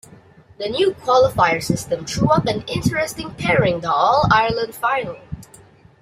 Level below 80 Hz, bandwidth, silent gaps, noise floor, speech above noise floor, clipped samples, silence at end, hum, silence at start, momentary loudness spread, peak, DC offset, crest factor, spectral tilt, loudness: -44 dBFS; 16 kHz; none; -47 dBFS; 29 dB; under 0.1%; 0.55 s; none; 0.6 s; 10 LU; 0 dBFS; under 0.1%; 18 dB; -5 dB/octave; -18 LUFS